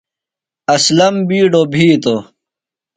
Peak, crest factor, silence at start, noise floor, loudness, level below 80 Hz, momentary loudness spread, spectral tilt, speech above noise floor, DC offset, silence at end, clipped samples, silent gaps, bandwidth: 0 dBFS; 14 dB; 0.7 s; -86 dBFS; -12 LUFS; -54 dBFS; 8 LU; -4.5 dB/octave; 75 dB; under 0.1%; 0.75 s; under 0.1%; none; 9.4 kHz